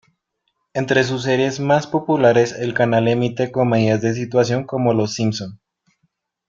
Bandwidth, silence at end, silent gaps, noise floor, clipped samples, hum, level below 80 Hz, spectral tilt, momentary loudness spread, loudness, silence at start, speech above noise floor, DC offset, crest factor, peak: 7.6 kHz; 0.95 s; none; -72 dBFS; under 0.1%; none; -56 dBFS; -6 dB/octave; 7 LU; -18 LUFS; 0.75 s; 55 dB; under 0.1%; 18 dB; -2 dBFS